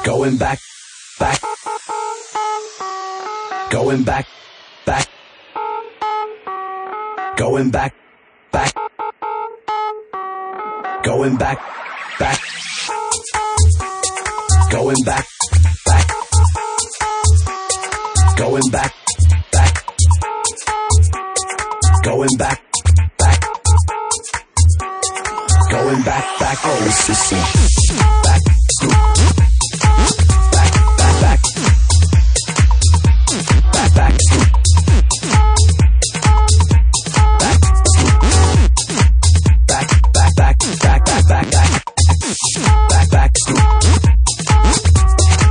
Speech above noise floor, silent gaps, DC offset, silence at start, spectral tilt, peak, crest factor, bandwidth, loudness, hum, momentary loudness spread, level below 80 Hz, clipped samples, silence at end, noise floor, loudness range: 34 dB; none; under 0.1%; 0 s; -4.5 dB/octave; 0 dBFS; 12 dB; 10.5 kHz; -14 LUFS; none; 12 LU; -18 dBFS; under 0.1%; 0 s; -50 dBFS; 9 LU